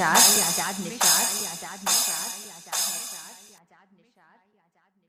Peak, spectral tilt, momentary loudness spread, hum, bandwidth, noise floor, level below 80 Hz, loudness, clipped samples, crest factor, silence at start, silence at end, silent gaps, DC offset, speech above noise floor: -4 dBFS; 0 dB/octave; 19 LU; none; 16 kHz; -68 dBFS; -72 dBFS; -22 LUFS; under 0.1%; 22 dB; 0 s; 1.7 s; none; under 0.1%; 45 dB